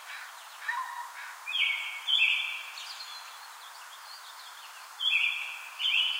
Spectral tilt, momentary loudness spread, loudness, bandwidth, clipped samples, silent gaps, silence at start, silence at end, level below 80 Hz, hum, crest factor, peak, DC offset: 7.5 dB/octave; 20 LU; -29 LUFS; 16.5 kHz; under 0.1%; none; 0 s; 0 s; under -90 dBFS; none; 20 dB; -14 dBFS; under 0.1%